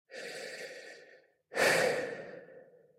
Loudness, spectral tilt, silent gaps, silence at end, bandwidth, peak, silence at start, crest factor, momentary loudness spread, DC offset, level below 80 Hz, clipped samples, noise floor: -32 LUFS; -2 dB/octave; none; 0.35 s; 16 kHz; -14 dBFS; 0.1 s; 22 dB; 24 LU; under 0.1%; -84 dBFS; under 0.1%; -61 dBFS